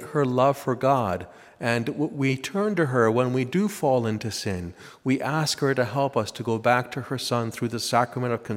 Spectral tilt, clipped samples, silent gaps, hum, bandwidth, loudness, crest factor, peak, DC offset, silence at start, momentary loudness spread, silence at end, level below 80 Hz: -5.5 dB/octave; under 0.1%; none; none; 16 kHz; -25 LUFS; 20 dB; -6 dBFS; under 0.1%; 0 s; 8 LU; 0 s; -62 dBFS